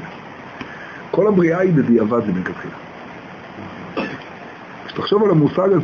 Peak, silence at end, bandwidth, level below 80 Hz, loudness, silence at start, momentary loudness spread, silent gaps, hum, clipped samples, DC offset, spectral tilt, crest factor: -2 dBFS; 0 s; 6.8 kHz; -54 dBFS; -17 LUFS; 0 s; 20 LU; none; none; under 0.1%; under 0.1%; -8.5 dB/octave; 16 dB